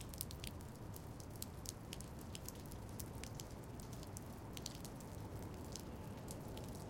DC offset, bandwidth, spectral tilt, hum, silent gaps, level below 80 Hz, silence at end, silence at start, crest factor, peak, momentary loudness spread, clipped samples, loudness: under 0.1%; 17 kHz; -4.5 dB/octave; none; none; -58 dBFS; 0 s; 0 s; 32 dB; -18 dBFS; 3 LU; under 0.1%; -50 LUFS